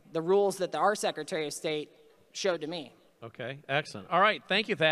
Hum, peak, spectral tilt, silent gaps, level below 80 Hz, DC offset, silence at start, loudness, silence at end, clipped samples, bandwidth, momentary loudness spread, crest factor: none; -12 dBFS; -3.5 dB/octave; none; -80 dBFS; under 0.1%; 0.1 s; -29 LUFS; 0 s; under 0.1%; 14.5 kHz; 17 LU; 20 dB